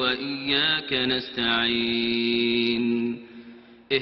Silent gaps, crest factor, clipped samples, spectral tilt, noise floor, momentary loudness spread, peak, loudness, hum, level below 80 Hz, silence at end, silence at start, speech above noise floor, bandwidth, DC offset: none; 16 dB; under 0.1%; -6.5 dB/octave; -47 dBFS; 6 LU; -8 dBFS; -23 LUFS; none; -58 dBFS; 0 s; 0 s; 22 dB; 5.8 kHz; under 0.1%